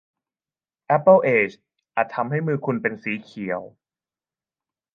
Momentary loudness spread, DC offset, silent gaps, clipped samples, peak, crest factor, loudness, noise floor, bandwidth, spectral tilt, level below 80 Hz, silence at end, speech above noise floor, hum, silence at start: 14 LU; under 0.1%; none; under 0.1%; -2 dBFS; 20 dB; -22 LUFS; under -90 dBFS; 6.6 kHz; -9 dB/octave; -72 dBFS; 1.25 s; over 69 dB; none; 0.9 s